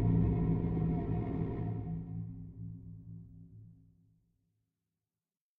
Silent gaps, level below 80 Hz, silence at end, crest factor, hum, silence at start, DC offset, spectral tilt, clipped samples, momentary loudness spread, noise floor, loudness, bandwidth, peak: none; -46 dBFS; 1.85 s; 18 dB; none; 0 s; under 0.1%; -11.5 dB/octave; under 0.1%; 22 LU; under -90 dBFS; -35 LUFS; 3.4 kHz; -20 dBFS